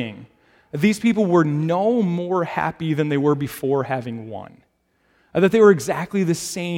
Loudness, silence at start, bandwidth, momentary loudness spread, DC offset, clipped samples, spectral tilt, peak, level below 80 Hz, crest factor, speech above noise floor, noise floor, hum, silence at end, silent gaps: -20 LUFS; 0 s; 16.5 kHz; 15 LU; under 0.1%; under 0.1%; -6.5 dB/octave; -2 dBFS; -60 dBFS; 18 dB; 45 dB; -65 dBFS; none; 0 s; none